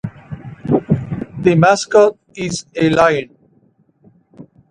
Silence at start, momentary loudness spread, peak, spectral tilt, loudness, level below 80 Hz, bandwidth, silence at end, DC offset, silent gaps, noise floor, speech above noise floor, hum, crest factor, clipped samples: 0.05 s; 18 LU; 0 dBFS; -6 dB/octave; -15 LUFS; -46 dBFS; 10.5 kHz; 0.3 s; under 0.1%; none; -56 dBFS; 42 dB; none; 16 dB; under 0.1%